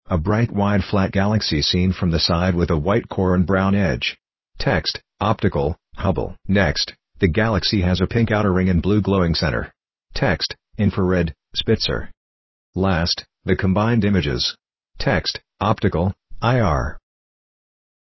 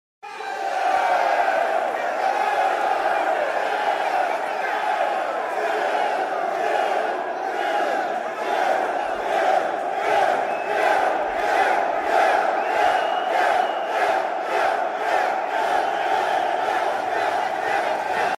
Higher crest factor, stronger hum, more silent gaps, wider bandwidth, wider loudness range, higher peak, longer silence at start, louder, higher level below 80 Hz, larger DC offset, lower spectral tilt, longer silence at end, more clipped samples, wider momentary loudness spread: about the same, 18 dB vs 14 dB; neither; first, 12.17-12.73 s vs none; second, 6.2 kHz vs 15.5 kHz; about the same, 3 LU vs 3 LU; first, -2 dBFS vs -8 dBFS; second, 0.1 s vs 0.25 s; about the same, -20 LUFS vs -22 LUFS; first, -32 dBFS vs -64 dBFS; neither; first, -6.5 dB/octave vs -2.5 dB/octave; first, 1.1 s vs 0.05 s; neither; about the same, 7 LU vs 5 LU